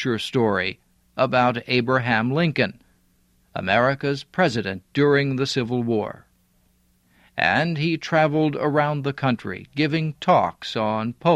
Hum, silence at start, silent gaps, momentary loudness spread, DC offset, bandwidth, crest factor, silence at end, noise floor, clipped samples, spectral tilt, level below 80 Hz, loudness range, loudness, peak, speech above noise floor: none; 0 s; none; 7 LU; under 0.1%; 12.5 kHz; 18 dB; 0 s; -62 dBFS; under 0.1%; -6.5 dB/octave; -58 dBFS; 2 LU; -22 LUFS; -4 dBFS; 41 dB